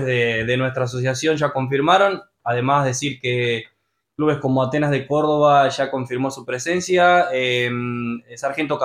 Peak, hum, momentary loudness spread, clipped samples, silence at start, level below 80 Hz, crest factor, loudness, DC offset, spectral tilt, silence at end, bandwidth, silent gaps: -2 dBFS; none; 10 LU; under 0.1%; 0 s; -56 dBFS; 18 dB; -19 LUFS; under 0.1%; -5 dB/octave; 0 s; 14.5 kHz; none